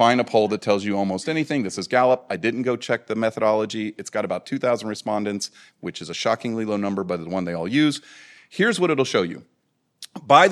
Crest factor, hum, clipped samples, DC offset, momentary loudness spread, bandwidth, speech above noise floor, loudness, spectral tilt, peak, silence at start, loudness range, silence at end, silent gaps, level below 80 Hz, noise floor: 20 dB; none; under 0.1%; under 0.1%; 12 LU; 13 kHz; 48 dB; -23 LUFS; -5 dB/octave; -2 dBFS; 0 s; 4 LU; 0 s; none; -70 dBFS; -70 dBFS